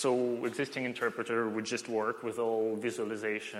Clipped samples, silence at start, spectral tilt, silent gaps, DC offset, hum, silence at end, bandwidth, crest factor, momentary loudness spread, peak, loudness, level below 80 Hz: under 0.1%; 0 s; -4.5 dB/octave; none; under 0.1%; none; 0 s; 15 kHz; 16 dB; 4 LU; -18 dBFS; -33 LUFS; -82 dBFS